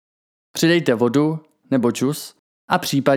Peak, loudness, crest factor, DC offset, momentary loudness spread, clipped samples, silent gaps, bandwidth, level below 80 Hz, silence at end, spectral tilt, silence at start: -2 dBFS; -19 LUFS; 18 dB; under 0.1%; 14 LU; under 0.1%; 2.39-2.68 s; 20 kHz; -66 dBFS; 0 s; -5 dB/octave; 0.55 s